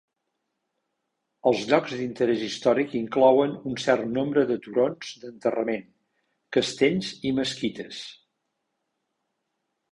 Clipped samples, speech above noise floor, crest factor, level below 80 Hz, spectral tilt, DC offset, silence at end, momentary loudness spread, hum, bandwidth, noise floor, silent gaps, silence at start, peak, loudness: under 0.1%; 55 dB; 20 dB; -66 dBFS; -5 dB/octave; under 0.1%; 1.75 s; 12 LU; none; 11.5 kHz; -80 dBFS; none; 1.45 s; -6 dBFS; -25 LUFS